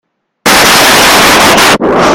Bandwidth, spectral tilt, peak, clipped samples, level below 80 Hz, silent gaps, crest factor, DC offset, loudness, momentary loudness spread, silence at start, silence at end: over 20 kHz; -2 dB/octave; 0 dBFS; 5%; -32 dBFS; none; 6 dB; under 0.1%; -3 LUFS; 4 LU; 0.45 s; 0 s